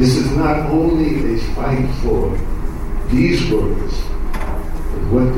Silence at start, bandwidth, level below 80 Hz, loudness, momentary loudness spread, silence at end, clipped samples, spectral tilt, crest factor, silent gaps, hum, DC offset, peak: 0 s; 13 kHz; -20 dBFS; -19 LUFS; 11 LU; 0 s; under 0.1%; -7 dB/octave; 12 dB; none; none; under 0.1%; -2 dBFS